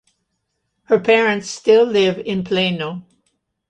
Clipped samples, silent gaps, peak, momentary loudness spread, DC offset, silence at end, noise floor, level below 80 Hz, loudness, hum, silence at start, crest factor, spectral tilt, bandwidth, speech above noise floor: under 0.1%; none; -2 dBFS; 11 LU; under 0.1%; 0.7 s; -73 dBFS; -60 dBFS; -17 LUFS; none; 0.9 s; 16 dB; -5 dB/octave; 9.4 kHz; 56 dB